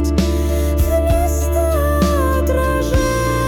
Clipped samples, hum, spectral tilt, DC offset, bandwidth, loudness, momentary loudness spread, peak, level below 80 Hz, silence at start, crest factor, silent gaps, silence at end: under 0.1%; none; -6 dB/octave; under 0.1%; 17.5 kHz; -17 LUFS; 2 LU; -6 dBFS; -20 dBFS; 0 s; 10 dB; none; 0 s